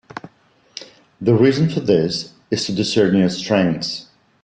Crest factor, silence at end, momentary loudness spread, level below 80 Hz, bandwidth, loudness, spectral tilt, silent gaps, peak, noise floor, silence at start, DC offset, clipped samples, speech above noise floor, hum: 16 dB; 0.4 s; 21 LU; -54 dBFS; 9.4 kHz; -18 LUFS; -6 dB/octave; none; -2 dBFS; -55 dBFS; 0.15 s; under 0.1%; under 0.1%; 38 dB; none